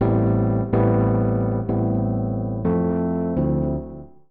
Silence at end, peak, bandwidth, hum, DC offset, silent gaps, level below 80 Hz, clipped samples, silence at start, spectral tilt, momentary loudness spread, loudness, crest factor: 0.25 s; -10 dBFS; 2.9 kHz; none; 0.5%; none; -36 dBFS; under 0.1%; 0 s; -14 dB/octave; 6 LU; -22 LUFS; 12 dB